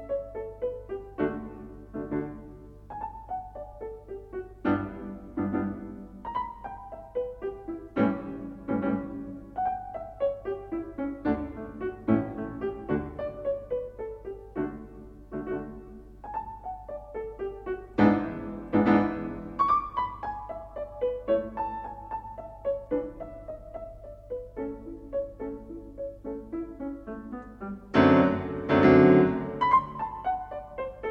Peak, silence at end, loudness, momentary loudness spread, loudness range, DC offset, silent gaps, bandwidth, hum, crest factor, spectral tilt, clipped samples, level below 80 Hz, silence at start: -6 dBFS; 0 s; -29 LUFS; 18 LU; 14 LU; under 0.1%; none; 6.4 kHz; none; 22 dB; -9 dB/octave; under 0.1%; -50 dBFS; 0 s